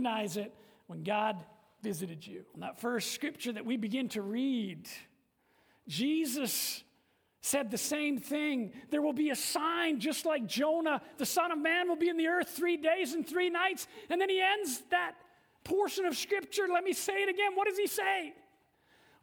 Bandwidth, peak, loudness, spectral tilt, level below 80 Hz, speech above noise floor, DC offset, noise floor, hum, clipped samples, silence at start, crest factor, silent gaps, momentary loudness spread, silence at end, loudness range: over 20 kHz; -16 dBFS; -33 LUFS; -3 dB/octave; -78 dBFS; 40 dB; under 0.1%; -73 dBFS; none; under 0.1%; 0 s; 18 dB; none; 11 LU; 0.9 s; 6 LU